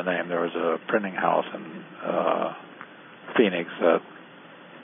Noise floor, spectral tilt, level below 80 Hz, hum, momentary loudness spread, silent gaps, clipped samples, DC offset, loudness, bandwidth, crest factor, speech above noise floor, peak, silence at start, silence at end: -47 dBFS; -10 dB/octave; -82 dBFS; none; 22 LU; none; under 0.1%; under 0.1%; -26 LUFS; 3.8 kHz; 22 dB; 22 dB; -6 dBFS; 0 s; 0 s